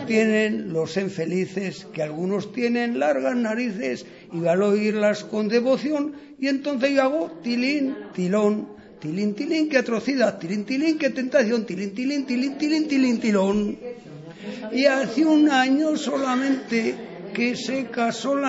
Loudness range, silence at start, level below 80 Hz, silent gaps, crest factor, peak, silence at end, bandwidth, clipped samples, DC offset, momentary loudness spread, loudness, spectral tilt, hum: 3 LU; 0 s; -64 dBFS; none; 18 dB; -6 dBFS; 0 s; 8 kHz; under 0.1%; under 0.1%; 10 LU; -23 LUFS; -5.5 dB/octave; none